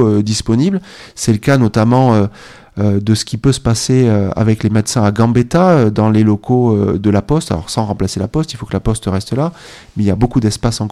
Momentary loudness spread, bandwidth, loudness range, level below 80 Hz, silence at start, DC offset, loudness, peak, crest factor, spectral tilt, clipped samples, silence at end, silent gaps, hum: 8 LU; 13 kHz; 5 LU; -34 dBFS; 0 s; under 0.1%; -14 LUFS; 0 dBFS; 12 dB; -6.5 dB/octave; under 0.1%; 0 s; none; none